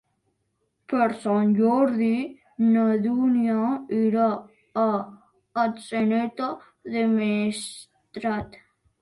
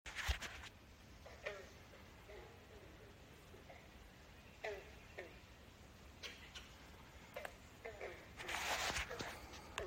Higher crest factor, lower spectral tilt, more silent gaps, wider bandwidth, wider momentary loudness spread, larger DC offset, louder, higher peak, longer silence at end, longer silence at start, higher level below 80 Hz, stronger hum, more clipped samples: second, 16 dB vs 28 dB; first, -6.5 dB/octave vs -2.5 dB/octave; neither; second, 11.5 kHz vs 16 kHz; second, 13 LU vs 18 LU; neither; first, -24 LUFS vs -49 LUFS; first, -8 dBFS vs -24 dBFS; first, 0.45 s vs 0 s; first, 0.9 s vs 0.05 s; about the same, -62 dBFS vs -60 dBFS; neither; neither